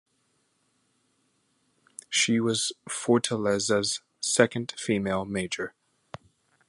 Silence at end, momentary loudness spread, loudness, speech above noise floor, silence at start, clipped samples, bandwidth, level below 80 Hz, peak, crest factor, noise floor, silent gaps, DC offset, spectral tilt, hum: 1 s; 23 LU; -26 LUFS; 45 dB; 2.1 s; under 0.1%; 11.5 kHz; -62 dBFS; -4 dBFS; 26 dB; -72 dBFS; none; under 0.1%; -3.5 dB/octave; none